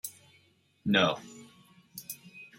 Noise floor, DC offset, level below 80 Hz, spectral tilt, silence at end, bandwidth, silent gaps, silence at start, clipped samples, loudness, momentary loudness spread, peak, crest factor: -66 dBFS; under 0.1%; -72 dBFS; -4 dB/octave; 0.15 s; 16.5 kHz; none; 0.05 s; under 0.1%; -30 LUFS; 23 LU; -8 dBFS; 26 dB